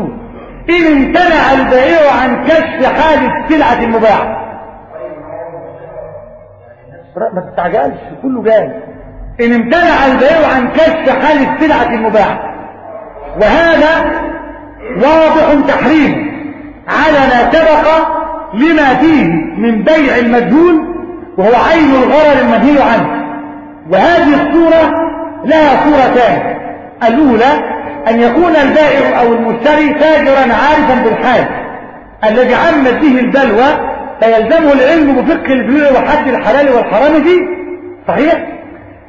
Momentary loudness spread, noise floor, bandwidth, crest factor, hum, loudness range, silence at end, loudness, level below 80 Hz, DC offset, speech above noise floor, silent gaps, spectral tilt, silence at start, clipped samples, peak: 17 LU; -36 dBFS; 7.6 kHz; 10 dB; none; 5 LU; 0.2 s; -9 LUFS; -34 dBFS; under 0.1%; 28 dB; none; -6.5 dB/octave; 0 s; under 0.1%; 0 dBFS